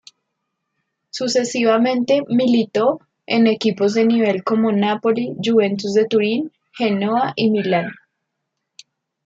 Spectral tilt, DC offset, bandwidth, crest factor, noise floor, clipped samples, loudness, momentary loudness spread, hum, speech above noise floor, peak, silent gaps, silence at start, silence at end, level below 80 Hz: -5.5 dB/octave; under 0.1%; 7.8 kHz; 16 dB; -77 dBFS; under 0.1%; -18 LUFS; 6 LU; none; 60 dB; -4 dBFS; none; 1.15 s; 1.35 s; -68 dBFS